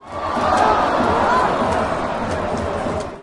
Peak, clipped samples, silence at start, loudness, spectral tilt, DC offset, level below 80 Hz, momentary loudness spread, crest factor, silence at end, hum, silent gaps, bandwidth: -4 dBFS; under 0.1%; 0.05 s; -19 LUFS; -5.5 dB/octave; under 0.1%; -40 dBFS; 7 LU; 16 dB; 0 s; none; none; 11.5 kHz